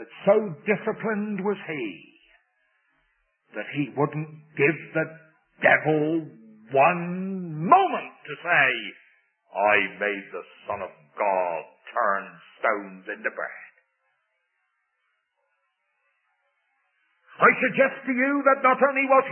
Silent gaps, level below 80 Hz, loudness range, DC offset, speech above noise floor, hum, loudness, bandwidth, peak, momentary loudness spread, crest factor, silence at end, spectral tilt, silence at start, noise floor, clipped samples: none; -76 dBFS; 9 LU; under 0.1%; 51 dB; none; -24 LUFS; 3.4 kHz; -4 dBFS; 16 LU; 22 dB; 0 s; -10 dB/octave; 0 s; -75 dBFS; under 0.1%